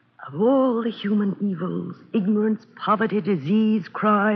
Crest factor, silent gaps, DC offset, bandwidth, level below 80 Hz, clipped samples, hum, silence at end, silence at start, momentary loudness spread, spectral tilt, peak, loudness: 14 dB; none; under 0.1%; 5.2 kHz; -76 dBFS; under 0.1%; none; 0 s; 0.2 s; 8 LU; -6 dB/octave; -6 dBFS; -22 LUFS